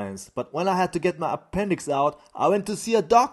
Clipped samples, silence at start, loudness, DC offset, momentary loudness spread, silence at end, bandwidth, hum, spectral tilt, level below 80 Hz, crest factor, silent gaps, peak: under 0.1%; 0 s; -24 LUFS; under 0.1%; 8 LU; 0 s; 12.5 kHz; none; -5 dB/octave; -54 dBFS; 20 dB; none; -4 dBFS